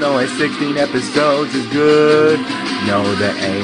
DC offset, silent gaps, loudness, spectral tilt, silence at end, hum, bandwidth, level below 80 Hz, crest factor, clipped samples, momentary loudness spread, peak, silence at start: under 0.1%; none; -15 LUFS; -5 dB/octave; 0 s; none; 10.5 kHz; -56 dBFS; 14 dB; under 0.1%; 7 LU; 0 dBFS; 0 s